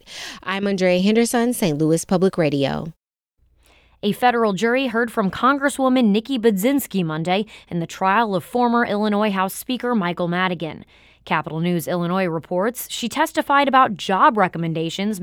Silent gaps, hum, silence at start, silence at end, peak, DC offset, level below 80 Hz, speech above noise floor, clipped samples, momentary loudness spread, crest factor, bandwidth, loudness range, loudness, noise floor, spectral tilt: none; none; 0.1 s; 0 s; -2 dBFS; under 0.1%; -56 dBFS; 45 dB; under 0.1%; 8 LU; 18 dB; 18.5 kHz; 4 LU; -20 LUFS; -65 dBFS; -5 dB/octave